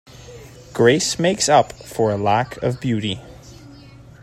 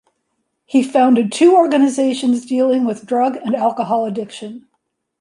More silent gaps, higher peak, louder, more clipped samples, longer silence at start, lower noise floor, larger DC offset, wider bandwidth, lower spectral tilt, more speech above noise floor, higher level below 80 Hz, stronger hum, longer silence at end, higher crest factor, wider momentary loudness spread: neither; about the same, -2 dBFS vs -2 dBFS; second, -19 LUFS vs -15 LUFS; neither; second, 0.2 s vs 0.7 s; second, -42 dBFS vs -71 dBFS; neither; first, 16 kHz vs 11.5 kHz; about the same, -4.5 dB/octave vs -5 dB/octave; second, 24 dB vs 56 dB; first, -50 dBFS vs -68 dBFS; neither; second, 0.2 s vs 0.6 s; first, 20 dB vs 14 dB; first, 16 LU vs 12 LU